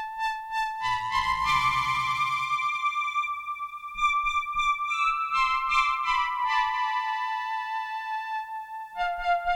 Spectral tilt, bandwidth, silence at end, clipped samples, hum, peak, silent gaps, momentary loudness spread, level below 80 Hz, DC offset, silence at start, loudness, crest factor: -1.5 dB/octave; 16.5 kHz; 0 s; under 0.1%; none; -12 dBFS; none; 9 LU; -52 dBFS; under 0.1%; 0 s; -27 LUFS; 16 dB